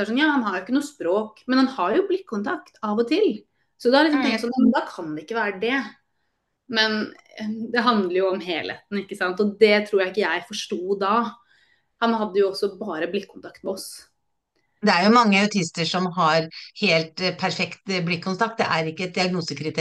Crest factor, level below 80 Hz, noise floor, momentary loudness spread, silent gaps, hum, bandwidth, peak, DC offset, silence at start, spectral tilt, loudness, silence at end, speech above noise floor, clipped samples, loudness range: 20 dB; -70 dBFS; -74 dBFS; 13 LU; none; none; 12.5 kHz; -2 dBFS; under 0.1%; 0 s; -5 dB/octave; -22 LUFS; 0 s; 52 dB; under 0.1%; 5 LU